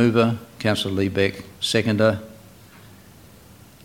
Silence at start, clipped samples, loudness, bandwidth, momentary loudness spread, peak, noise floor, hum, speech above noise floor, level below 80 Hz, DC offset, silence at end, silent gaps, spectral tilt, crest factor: 0 s; under 0.1%; -22 LUFS; 17 kHz; 8 LU; -4 dBFS; -47 dBFS; none; 27 dB; -56 dBFS; under 0.1%; 1.5 s; none; -5.5 dB/octave; 20 dB